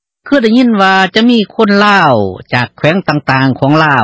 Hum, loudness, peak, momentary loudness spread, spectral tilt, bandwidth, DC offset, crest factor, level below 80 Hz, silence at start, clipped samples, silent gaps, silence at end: none; -9 LUFS; 0 dBFS; 7 LU; -6.5 dB/octave; 8 kHz; under 0.1%; 10 dB; -46 dBFS; 0.25 s; 0.9%; none; 0 s